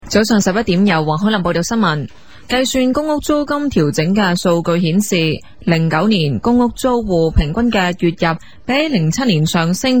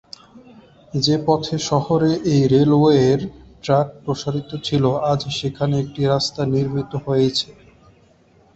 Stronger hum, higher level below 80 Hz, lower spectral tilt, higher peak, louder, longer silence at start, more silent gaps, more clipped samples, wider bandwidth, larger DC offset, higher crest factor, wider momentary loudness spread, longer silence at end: neither; first, -32 dBFS vs -50 dBFS; about the same, -5.5 dB/octave vs -6.5 dB/octave; about the same, 0 dBFS vs -2 dBFS; first, -15 LUFS vs -19 LUFS; second, 0.05 s vs 0.35 s; neither; neither; first, 19 kHz vs 8.2 kHz; first, 1% vs under 0.1%; about the same, 14 dB vs 16 dB; second, 4 LU vs 11 LU; second, 0 s vs 1.05 s